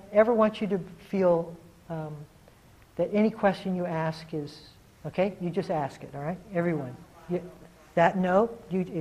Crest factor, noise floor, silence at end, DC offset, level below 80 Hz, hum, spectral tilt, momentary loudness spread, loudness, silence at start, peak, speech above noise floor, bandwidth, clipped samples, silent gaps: 22 dB; -55 dBFS; 0 s; under 0.1%; -60 dBFS; none; -8 dB/octave; 17 LU; -28 LUFS; 0.05 s; -6 dBFS; 28 dB; 13.5 kHz; under 0.1%; none